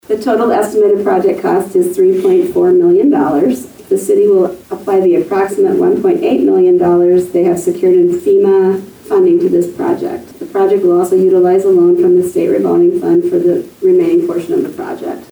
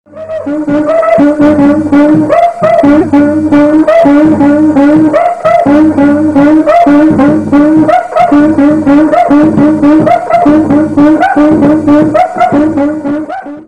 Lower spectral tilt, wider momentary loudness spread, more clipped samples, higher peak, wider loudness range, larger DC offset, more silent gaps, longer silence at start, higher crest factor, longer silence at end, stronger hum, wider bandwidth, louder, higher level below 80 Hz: about the same, -7 dB/octave vs -8 dB/octave; first, 8 LU vs 4 LU; second, under 0.1% vs 8%; about the same, -2 dBFS vs 0 dBFS; about the same, 2 LU vs 1 LU; second, under 0.1% vs 1%; neither; about the same, 0.1 s vs 0.15 s; about the same, 8 dB vs 6 dB; about the same, 0.05 s vs 0.05 s; neither; first, over 20 kHz vs 9.2 kHz; second, -11 LUFS vs -6 LUFS; second, -54 dBFS vs -38 dBFS